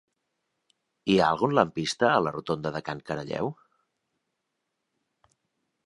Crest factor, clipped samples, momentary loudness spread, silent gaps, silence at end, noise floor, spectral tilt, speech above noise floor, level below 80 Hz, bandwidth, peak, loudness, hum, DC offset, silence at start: 24 dB; under 0.1%; 11 LU; none; 2.35 s; -81 dBFS; -5.5 dB/octave; 55 dB; -62 dBFS; 11.5 kHz; -4 dBFS; -27 LUFS; none; under 0.1%; 1.05 s